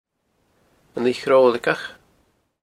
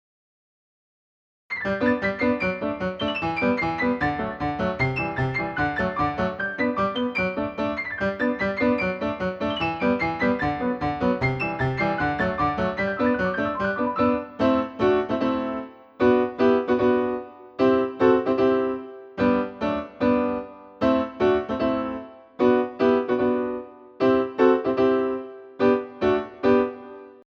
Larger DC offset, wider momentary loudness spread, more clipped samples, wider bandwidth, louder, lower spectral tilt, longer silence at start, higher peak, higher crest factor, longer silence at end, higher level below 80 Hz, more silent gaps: neither; first, 18 LU vs 7 LU; neither; first, 12 kHz vs 6.8 kHz; first, -19 LUFS vs -23 LUFS; second, -5 dB/octave vs -8 dB/octave; second, 0.95 s vs 1.5 s; first, -2 dBFS vs -6 dBFS; about the same, 20 dB vs 18 dB; first, 0.7 s vs 0.1 s; second, -66 dBFS vs -48 dBFS; neither